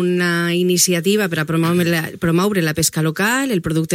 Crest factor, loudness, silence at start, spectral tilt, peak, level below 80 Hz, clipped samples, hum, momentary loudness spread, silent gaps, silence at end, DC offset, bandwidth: 16 dB; -17 LUFS; 0 s; -4.5 dB/octave; -2 dBFS; -48 dBFS; under 0.1%; none; 4 LU; none; 0 s; under 0.1%; 16.5 kHz